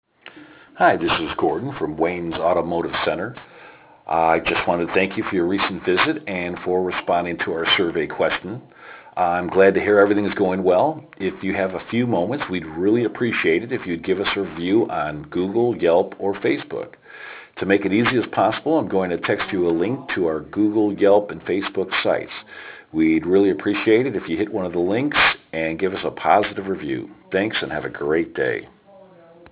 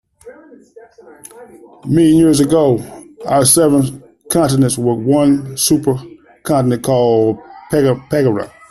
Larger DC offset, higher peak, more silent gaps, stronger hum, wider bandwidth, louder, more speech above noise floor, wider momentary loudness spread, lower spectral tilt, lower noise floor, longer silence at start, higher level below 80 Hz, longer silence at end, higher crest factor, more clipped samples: neither; about the same, -2 dBFS vs 0 dBFS; neither; neither; second, 4 kHz vs 14 kHz; second, -21 LUFS vs -13 LUFS; about the same, 27 dB vs 26 dB; about the same, 10 LU vs 12 LU; first, -9.5 dB/octave vs -5.5 dB/octave; first, -48 dBFS vs -39 dBFS; about the same, 0.25 s vs 0.25 s; second, -52 dBFS vs -46 dBFS; first, 0.85 s vs 0.2 s; first, 20 dB vs 14 dB; neither